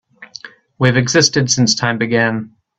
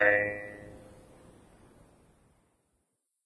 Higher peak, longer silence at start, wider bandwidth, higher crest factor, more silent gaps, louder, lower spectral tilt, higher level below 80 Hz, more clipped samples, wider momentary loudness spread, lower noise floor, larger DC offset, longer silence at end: first, 0 dBFS vs -10 dBFS; first, 0.2 s vs 0 s; second, 8.2 kHz vs 11 kHz; second, 16 dB vs 24 dB; neither; first, -14 LUFS vs -30 LUFS; second, -4 dB/octave vs -6 dB/octave; first, -52 dBFS vs -64 dBFS; neither; second, 21 LU vs 28 LU; second, -38 dBFS vs -80 dBFS; neither; second, 0.3 s vs 2.5 s